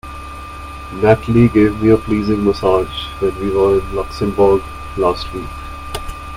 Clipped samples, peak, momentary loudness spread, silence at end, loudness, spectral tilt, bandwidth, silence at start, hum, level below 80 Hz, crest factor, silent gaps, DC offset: under 0.1%; 0 dBFS; 17 LU; 0 s; -15 LUFS; -7.5 dB/octave; 15.5 kHz; 0.05 s; none; -32 dBFS; 16 dB; none; under 0.1%